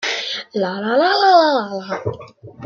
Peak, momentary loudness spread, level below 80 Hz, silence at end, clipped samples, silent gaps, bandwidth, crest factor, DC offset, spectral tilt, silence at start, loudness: -2 dBFS; 14 LU; -64 dBFS; 0 s; under 0.1%; none; 7.4 kHz; 16 dB; under 0.1%; -4 dB/octave; 0 s; -17 LUFS